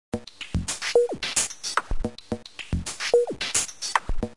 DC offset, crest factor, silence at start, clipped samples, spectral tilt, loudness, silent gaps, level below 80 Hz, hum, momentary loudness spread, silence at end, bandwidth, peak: 0.4%; 24 dB; 0.1 s; under 0.1%; -2.5 dB/octave; -26 LUFS; none; -36 dBFS; none; 12 LU; 0 s; 11.5 kHz; -4 dBFS